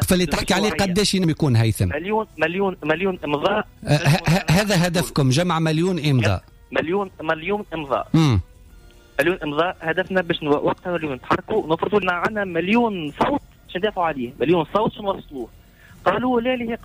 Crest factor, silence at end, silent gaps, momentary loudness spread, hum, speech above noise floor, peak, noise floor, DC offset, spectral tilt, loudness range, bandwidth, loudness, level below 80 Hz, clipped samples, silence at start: 14 dB; 0 s; none; 7 LU; none; 26 dB; -6 dBFS; -47 dBFS; under 0.1%; -5.5 dB/octave; 3 LU; 15.5 kHz; -21 LUFS; -44 dBFS; under 0.1%; 0 s